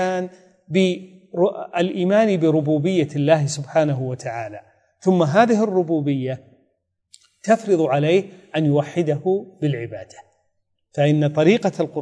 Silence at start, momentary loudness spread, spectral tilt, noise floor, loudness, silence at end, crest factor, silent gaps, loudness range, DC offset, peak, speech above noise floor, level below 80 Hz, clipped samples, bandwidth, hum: 0 s; 12 LU; -7 dB/octave; -70 dBFS; -20 LUFS; 0 s; 18 dB; none; 2 LU; under 0.1%; -2 dBFS; 51 dB; -70 dBFS; under 0.1%; 10.5 kHz; none